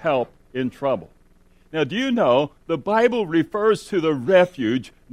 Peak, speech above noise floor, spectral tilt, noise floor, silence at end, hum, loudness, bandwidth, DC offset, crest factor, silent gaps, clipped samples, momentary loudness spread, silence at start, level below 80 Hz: -4 dBFS; 33 dB; -6 dB/octave; -54 dBFS; 0.25 s; none; -21 LUFS; 13 kHz; under 0.1%; 18 dB; none; under 0.1%; 10 LU; 0 s; -56 dBFS